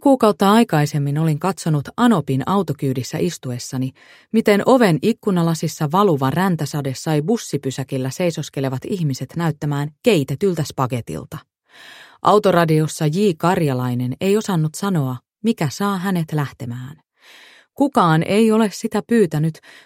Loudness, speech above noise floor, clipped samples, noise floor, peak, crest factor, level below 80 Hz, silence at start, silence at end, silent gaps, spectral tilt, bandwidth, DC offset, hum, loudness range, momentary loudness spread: -19 LUFS; 29 dB; under 0.1%; -47 dBFS; 0 dBFS; 18 dB; -56 dBFS; 0 s; 0.25 s; none; -6.5 dB/octave; 16.5 kHz; under 0.1%; none; 4 LU; 10 LU